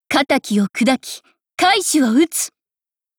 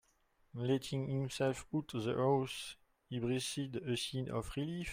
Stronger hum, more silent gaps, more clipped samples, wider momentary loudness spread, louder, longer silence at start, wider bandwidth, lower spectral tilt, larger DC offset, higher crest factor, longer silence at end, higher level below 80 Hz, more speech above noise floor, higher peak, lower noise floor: neither; neither; neither; first, 15 LU vs 10 LU; first, -17 LUFS vs -38 LUFS; second, 0.1 s vs 0.55 s; first, over 20 kHz vs 16 kHz; second, -3 dB/octave vs -5.5 dB/octave; neither; about the same, 16 dB vs 16 dB; first, 0.7 s vs 0 s; about the same, -62 dBFS vs -62 dBFS; first, over 73 dB vs 36 dB; first, -2 dBFS vs -22 dBFS; first, under -90 dBFS vs -74 dBFS